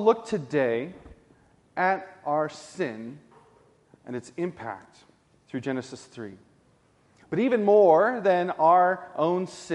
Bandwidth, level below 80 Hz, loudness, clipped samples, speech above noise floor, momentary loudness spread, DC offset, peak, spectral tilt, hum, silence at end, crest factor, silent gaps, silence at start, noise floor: 11 kHz; -66 dBFS; -25 LUFS; under 0.1%; 38 dB; 21 LU; under 0.1%; -6 dBFS; -6.5 dB/octave; none; 0 s; 20 dB; none; 0 s; -63 dBFS